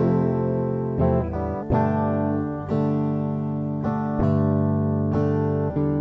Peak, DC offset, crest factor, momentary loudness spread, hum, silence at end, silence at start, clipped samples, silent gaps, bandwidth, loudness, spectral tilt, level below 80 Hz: -8 dBFS; under 0.1%; 14 dB; 5 LU; none; 0 s; 0 s; under 0.1%; none; 5.6 kHz; -23 LUFS; -11.5 dB/octave; -42 dBFS